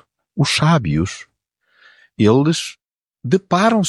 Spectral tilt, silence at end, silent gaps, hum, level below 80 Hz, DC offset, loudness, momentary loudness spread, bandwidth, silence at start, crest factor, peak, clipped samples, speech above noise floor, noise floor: -5.5 dB/octave; 0 s; none; none; -46 dBFS; under 0.1%; -17 LUFS; 17 LU; 12 kHz; 0.35 s; 16 dB; -2 dBFS; under 0.1%; 49 dB; -65 dBFS